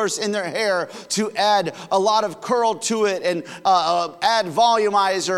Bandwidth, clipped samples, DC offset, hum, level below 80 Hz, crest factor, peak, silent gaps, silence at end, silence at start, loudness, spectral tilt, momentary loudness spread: 16 kHz; under 0.1%; under 0.1%; none; -72 dBFS; 14 dB; -6 dBFS; none; 0 s; 0 s; -20 LUFS; -3 dB/octave; 6 LU